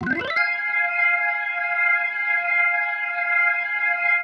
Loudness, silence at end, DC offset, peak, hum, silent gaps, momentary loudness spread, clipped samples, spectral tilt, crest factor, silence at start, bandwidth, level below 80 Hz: -20 LUFS; 0 s; under 0.1%; -8 dBFS; none; none; 4 LU; under 0.1%; -5 dB/octave; 14 dB; 0 s; 6.4 kHz; -66 dBFS